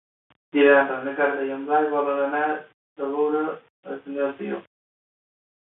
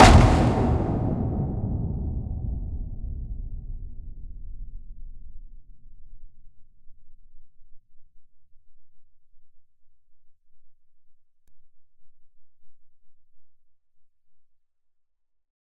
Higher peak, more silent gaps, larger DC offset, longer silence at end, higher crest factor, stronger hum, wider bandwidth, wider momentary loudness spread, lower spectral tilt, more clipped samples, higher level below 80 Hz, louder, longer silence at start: second, -4 dBFS vs 0 dBFS; first, 2.74-2.96 s, 3.70-3.83 s vs none; neither; second, 1.05 s vs 1.3 s; about the same, 22 dB vs 26 dB; neither; second, 4 kHz vs 12.5 kHz; second, 16 LU vs 25 LU; first, -9 dB/octave vs -6 dB/octave; neither; second, -74 dBFS vs -32 dBFS; about the same, -23 LUFS vs -24 LUFS; first, 0.55 s vs 0 s